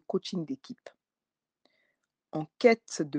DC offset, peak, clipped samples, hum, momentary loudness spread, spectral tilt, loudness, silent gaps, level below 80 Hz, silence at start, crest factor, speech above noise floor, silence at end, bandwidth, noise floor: under 0.1%; -8 dBFS; under 0.1%; none; 20 LU; -5 dB/octave; -29 LUFS; none; -82 dBFS; 0.1 s; 24 dB; over 60 dB; 0 s; 9.8 kHz; under -90 dBFS